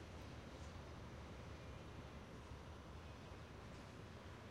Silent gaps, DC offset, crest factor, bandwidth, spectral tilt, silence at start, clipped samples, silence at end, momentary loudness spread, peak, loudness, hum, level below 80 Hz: none; under 0.1%; 14 dB; 15 kHz; -5.5 dB/octave; 0 s; under 0.1%; 0 s; 1 LU; -42 dBFS; -56 LUFS; none; -62 dBFS